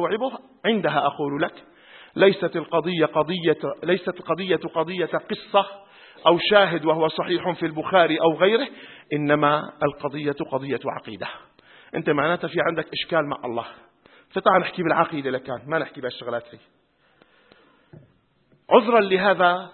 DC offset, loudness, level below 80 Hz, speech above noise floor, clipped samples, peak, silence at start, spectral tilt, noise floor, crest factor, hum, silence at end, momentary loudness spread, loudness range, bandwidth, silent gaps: under 0.1%; -22 LUFS; -66 dBFS; 40 dB; under 0.1%; 0 dBFS; 0 s; -10 dB/octave; -62 dBFS; 22 dB; none; 0.05 s; 13 LU; 6 LU; 4.4 kHz; none